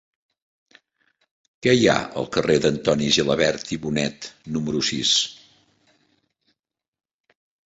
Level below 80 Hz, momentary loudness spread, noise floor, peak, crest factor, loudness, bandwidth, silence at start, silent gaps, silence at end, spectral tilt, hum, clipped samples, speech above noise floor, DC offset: -54 dBFS; 10 LU; -84 dBFS; -2 dBFS; 22 dB; -21 LUFS; 8.2 kHz; 1.65 s; none; 2.3 s; -3.5 dB/octave; none; under 0.1%; 63 dB; under 0.1%